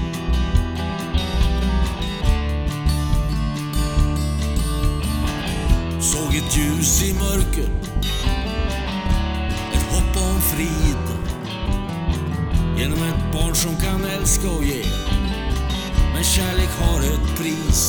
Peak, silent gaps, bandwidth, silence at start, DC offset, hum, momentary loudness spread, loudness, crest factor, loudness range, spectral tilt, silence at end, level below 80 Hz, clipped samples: -2 dBFS; none; over 20 kHz; 0 s; under 0.1%; none; 5 LU; -21 LUFS; 16 dB; 2 LU; -4.5 dB/octave; 0 s; -22 dBFS; under 0.1%